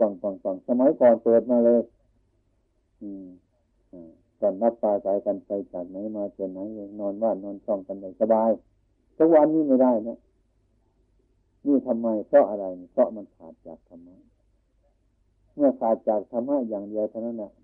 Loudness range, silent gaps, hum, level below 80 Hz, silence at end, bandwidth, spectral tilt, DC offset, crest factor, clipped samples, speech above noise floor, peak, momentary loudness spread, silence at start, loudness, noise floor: 7 LU; none; none; -68 dBFS; 0.15 s; 3 kHz; -11.5 dB/octave; under 0.1%; 18 dB; under 0.1%; 45 dB; -8 dBFS; 17 LU; 0 s; -24 LUFS; -69 dBFS